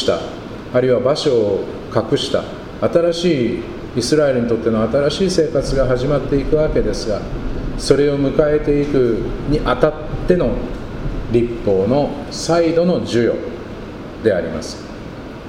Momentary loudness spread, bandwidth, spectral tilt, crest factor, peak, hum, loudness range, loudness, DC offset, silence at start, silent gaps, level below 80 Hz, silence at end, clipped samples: 12 LU; 12.5 kHz; -6 dB/octave; 18 dB; 0 dBFS; none; 2 LU; -17 LUFS; under 0.1%; 0 s; none; -30 dBFS; 0 s; under 0.1%